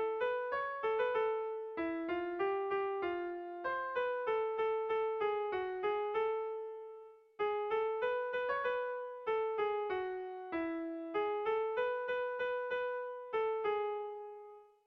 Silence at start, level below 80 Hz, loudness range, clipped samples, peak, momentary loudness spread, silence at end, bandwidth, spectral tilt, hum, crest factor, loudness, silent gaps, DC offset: 0 s; -74 dBFS; 1 LU; under 0.1%; -24 dBFS; 7 LU; 0.2 s; 5.4 kHz; -1.5 dB/octave; none; 14 dB; -37 LUFS; none; under 0.1%